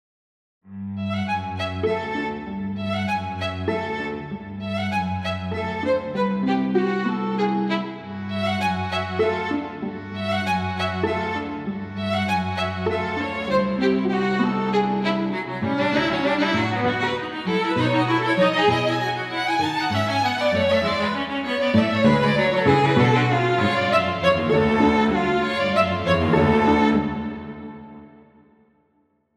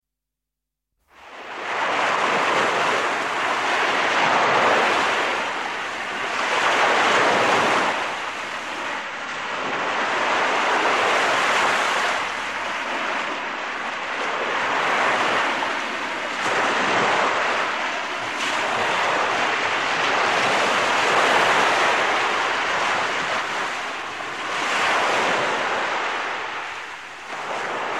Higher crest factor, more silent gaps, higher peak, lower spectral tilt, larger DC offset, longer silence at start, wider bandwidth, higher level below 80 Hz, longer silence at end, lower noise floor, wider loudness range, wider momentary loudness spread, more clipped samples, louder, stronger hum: about the same, 18 dB vs 16 dB; neither; about the same, -4 dBFS vs -6 dBFS; first, -6.5 dB/octave vs -2 dB/octave; second, under 0.1% vs 0.2%; second, 0.65 s vs 1.2 s; second, 13 kHz vs 15 kHz; first, -50 dBFS vs -66 dBFS; first, 1.3 s vs 0 s; second, -66 dBFS vs -84 dBFS; first, 7 LU vs 4 LU; about the same, 11 LU vs 10 LU; neither; about the same, -22 LUFS vs -21 LUFS; neither